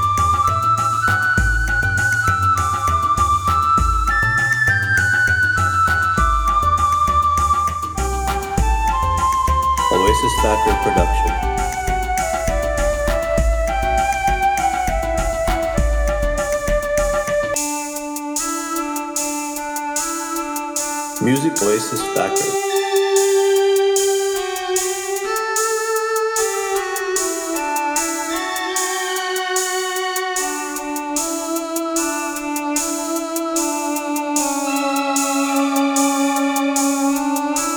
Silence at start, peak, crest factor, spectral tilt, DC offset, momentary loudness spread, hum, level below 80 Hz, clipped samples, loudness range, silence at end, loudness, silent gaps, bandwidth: 0 s; -2 dBFS; 18 dB; -3.5 dB/octave; under 0.1%; 6 LU; none; -28 dBFS; under 0.1%; 5 LU; 0 s; -18 LUFS; none; over 20 kHz